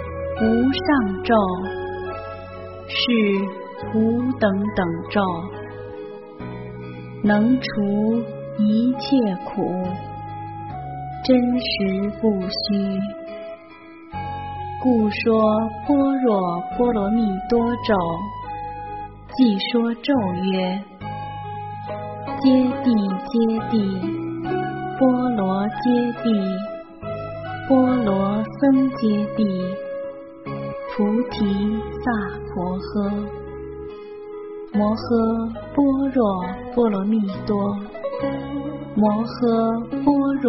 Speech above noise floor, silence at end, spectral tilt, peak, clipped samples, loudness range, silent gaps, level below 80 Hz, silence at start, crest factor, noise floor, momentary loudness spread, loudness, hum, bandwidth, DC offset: 23 dB; 0 s; -5.5 dB/octave; -4 dBFS; under 0.1%; 4 LU; none; -46 dBFS; 0 s; 16 dB; -42 dBFS; 15 LU; -22 LUFS; none; 5.8 kHz; 0.1%